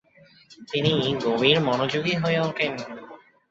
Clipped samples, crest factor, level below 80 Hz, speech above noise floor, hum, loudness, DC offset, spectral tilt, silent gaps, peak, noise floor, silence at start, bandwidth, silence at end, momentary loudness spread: under 0.1%; 22 dB; -62 dBFS; 31 dB; none; -23 LUFS; under 0.1%; -5.5 dB/octave; none; -4 dBFS; -54 dBFS; 0.5 s; 7.8 kHz; 0.35 s; 13 LU